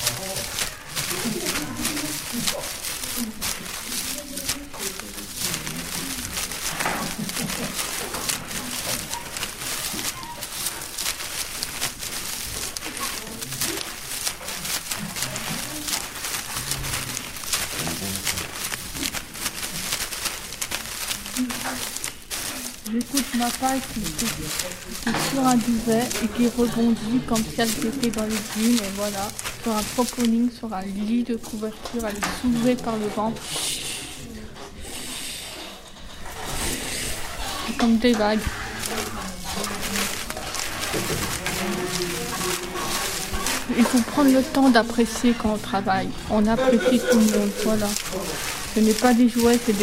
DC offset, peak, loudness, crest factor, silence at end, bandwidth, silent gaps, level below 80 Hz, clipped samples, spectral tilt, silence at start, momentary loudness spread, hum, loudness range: under 0.1%; -2 dBFS; -25 LUFS; 22 dB; 0 s; 16.5 kHz; none; -42 dBFS; under 0.1%; -3 dB/octave; 0 s; 10 LU; none; 7 LU